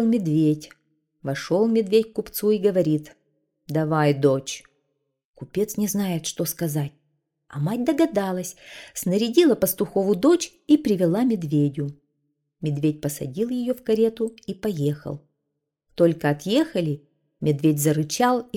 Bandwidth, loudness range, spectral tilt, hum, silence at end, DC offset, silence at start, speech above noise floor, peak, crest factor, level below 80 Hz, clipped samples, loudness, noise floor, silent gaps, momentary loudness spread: 18 kHz; 5 LU; -6 dB/octave; none; 0 s; under 0.1%; 0 s; 57 dB; -4 dBFS; 18 dB; -60 dBFS; under 0.1%; -23 LUFS; -80 dBFS; 5.24-5.34 s; 12 LU